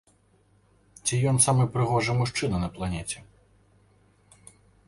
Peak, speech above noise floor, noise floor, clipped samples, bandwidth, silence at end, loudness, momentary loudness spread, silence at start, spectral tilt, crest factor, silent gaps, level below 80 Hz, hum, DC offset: -8 dBFS; 38 dB; -63 dBFS; under 0.1%; 11.5 kHz; 1.65 s; -25 LUFS; 12 LU; 1.05 s; -4.5 dB/octave; 20 dB; none; -48 dBFS; none; under 0.1%